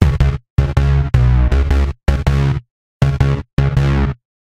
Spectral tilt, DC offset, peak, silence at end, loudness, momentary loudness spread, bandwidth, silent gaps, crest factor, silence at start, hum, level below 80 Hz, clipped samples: -8 dB/octave; under 0.1%; 0 dBFS; 0.4 s; -16 LUFS; 5 LU; 8.4 kHz; 0.50-0.57 s, 2.71-3.00 s, 3.53-3.57 s; 14 dB; 0 s; none; -18 dBFS; under 0.1%